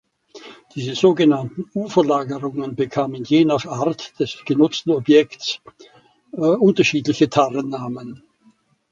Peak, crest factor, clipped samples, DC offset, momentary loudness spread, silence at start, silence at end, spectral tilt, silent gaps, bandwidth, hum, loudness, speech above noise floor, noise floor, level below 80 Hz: 0 dBFS; 18 dB; under 0.1%; under 0.1%; 13 LU; 0.35 s; 0.75 s; -6 dB/octave; none; 7.6 kHz; none; -19 LUFS; 39 dB; -57 dBFS; -62 dBFS